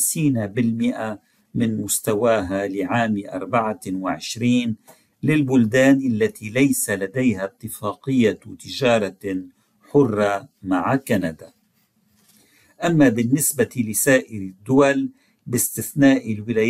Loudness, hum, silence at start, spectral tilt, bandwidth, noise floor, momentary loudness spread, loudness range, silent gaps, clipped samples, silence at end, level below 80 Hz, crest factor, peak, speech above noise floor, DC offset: -20 LUFS; none; 0 s; -5 dB/octave; 16 kHz; -64 dBFS; 12 LU; 3 LU; none; under 0.1%; 0 s; -56 dBFS; 18 dB; -4 dBFS; 44 dB; under 0.1%